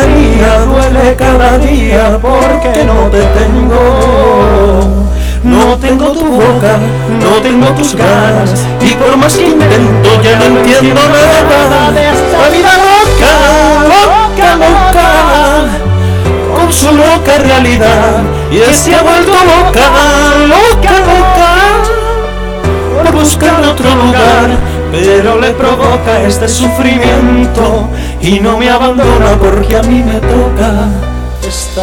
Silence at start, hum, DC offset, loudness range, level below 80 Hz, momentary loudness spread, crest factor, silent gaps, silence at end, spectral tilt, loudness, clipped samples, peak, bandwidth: 0 s; none; under 0.1%; 3 LU; -14 dBFS; 6 LU; 6 dB; none; 0 s; -5 dB/octave; -6 LUFS; 3%; 0 dBFS; 19 kHz